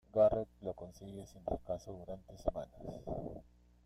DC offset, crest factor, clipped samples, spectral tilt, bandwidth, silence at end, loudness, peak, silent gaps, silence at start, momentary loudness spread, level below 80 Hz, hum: under 0.1%; 20 dB; under 0.1%; -8 dB/octave; 11.5 kHz; 0.45 s; -40 LUFS; -18 dBFS; none; 0.15 s; 18 LU; -56 dBFS; none